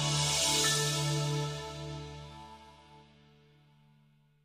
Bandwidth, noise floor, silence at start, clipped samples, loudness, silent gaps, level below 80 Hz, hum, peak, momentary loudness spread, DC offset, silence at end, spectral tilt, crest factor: 15.5 kHz; -66 dBFS; 0 s; under 0.1%; -30 LUFS; none; -56 dBFS; none; -16 dBFS; 22 LU; under 0.1%; 1.45 s; -2.5 dB/octave; 18 dB